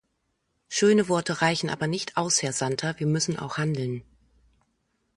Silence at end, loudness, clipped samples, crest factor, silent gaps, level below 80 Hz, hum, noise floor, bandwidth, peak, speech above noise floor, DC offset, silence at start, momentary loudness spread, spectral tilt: 1.15 s; -25 LUFS; under 0.1%; 20 dB; none; -62 dBFS; none; -75 dBFS; 11.5 kHz; -8 dBFS; 50 dB; under 0.1%; 0.7 s; 8 LU; -4 dB/octave